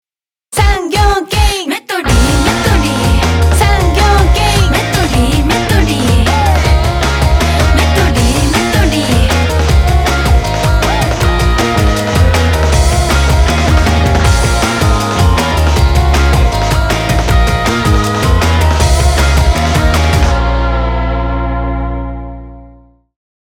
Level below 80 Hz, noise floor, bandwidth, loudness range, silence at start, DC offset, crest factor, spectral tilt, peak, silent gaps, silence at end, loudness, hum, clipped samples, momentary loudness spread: -14 dBFS; -48 dBFS; 17 kHz; 1 LU; 0.5 s; under 0.1%; 10 dB; -5 dB/octave; 0 dBFS; none; 0.75 s; -11 LUFS; 60 Hz at -30 dBFS; under 0.1%; 4 LU